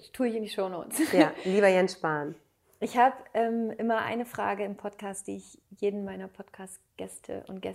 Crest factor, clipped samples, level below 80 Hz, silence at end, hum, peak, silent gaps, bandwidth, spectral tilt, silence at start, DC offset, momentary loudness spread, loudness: 24 dB; under 0.1%; -72 dBFS; 0 s; none; -6 dBFS; none; 16 kHz; -5 dB/octave; 0.05 s; under 0.1%; 19 LU; -29 LUFS